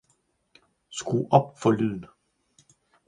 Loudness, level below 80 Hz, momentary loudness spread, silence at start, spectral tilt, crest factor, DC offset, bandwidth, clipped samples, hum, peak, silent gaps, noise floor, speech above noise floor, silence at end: -25 LUFS; -64 dBFS; 16 LU; 0.9 s; -6.5 dB/octave; 26 dB; under 0.1%; 10.5 kHz; under 0.1%; none; -2 dBFS; none; -70 dBFS; 46 dB; 1 s